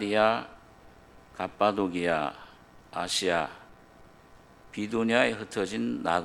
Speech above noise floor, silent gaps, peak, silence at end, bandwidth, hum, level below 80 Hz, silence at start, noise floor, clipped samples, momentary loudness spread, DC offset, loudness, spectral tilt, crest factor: 27 dB; none; -6 dBFS; 0 s; 14 kHz; none; -62 dBFS; 0 s; -54 dBFS; under 0.1%; 17 LU; under 0.1%; -28 LUFS; -4 dB/octave; 24 dB